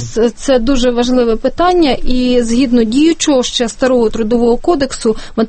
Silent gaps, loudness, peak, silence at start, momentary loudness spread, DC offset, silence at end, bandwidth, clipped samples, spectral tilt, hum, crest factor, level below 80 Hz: none; -12 LUFS; 0 dBFS; 0 s; 4 LU; under 0.1%; 0 s; 8.8 kHz; under 0.1%; -4 dB/octave; none; 12 dB; -24 dBFS